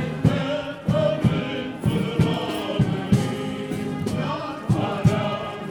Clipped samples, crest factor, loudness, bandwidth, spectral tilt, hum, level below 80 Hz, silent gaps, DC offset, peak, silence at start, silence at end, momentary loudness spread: under 0.1%; 18 dB; -24 LUFS; 19.5 kHz; -7 dB/octave; none; -44 dBFS; none; under 0.1%; -6 dBFS; 0 s; 0 s; 7 LU